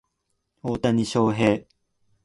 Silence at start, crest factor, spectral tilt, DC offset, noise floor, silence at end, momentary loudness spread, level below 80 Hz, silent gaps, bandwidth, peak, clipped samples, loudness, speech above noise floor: 0.65 s; 18 dB; -6.5 dB/octave; under 0.1%; -76 dBFS; 0.65 s; 10 LU; -54 dBFS; none; 11.5 kHz; -6 dBFS; under 0.1%; -23 LUFS; 54 dB